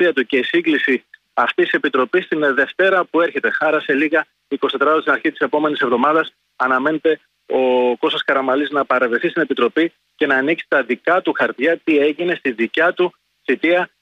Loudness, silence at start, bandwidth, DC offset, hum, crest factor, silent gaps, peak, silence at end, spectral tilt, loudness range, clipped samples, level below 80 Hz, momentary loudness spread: -17 LUFS; 0 s; 8 kHz; under 0.1%; none; 14 dB; none; -4 dBFS; 0.15 s; -6 dB/octave; 1 LU; under 0.1%; -68 dBFS; 6 LU